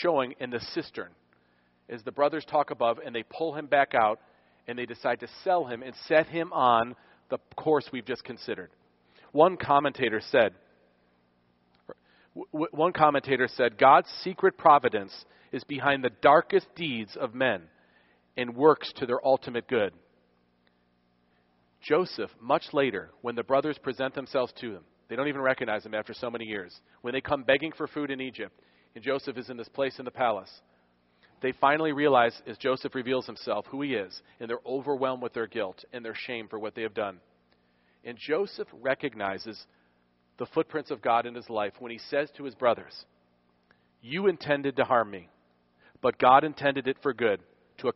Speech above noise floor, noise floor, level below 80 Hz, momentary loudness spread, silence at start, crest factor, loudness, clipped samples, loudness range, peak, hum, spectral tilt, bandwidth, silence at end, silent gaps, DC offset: 41 dB; -69 dBFS; -70 dBFS; 16 LU; 0 s; 24 dB; -28 LUFS; under 0.1%; 9 LU; -6 dBFS; 60 Hz at -65 dBFS; -3 dB/octave; 5.8 kHz; 0.05 s; none; under 0.1%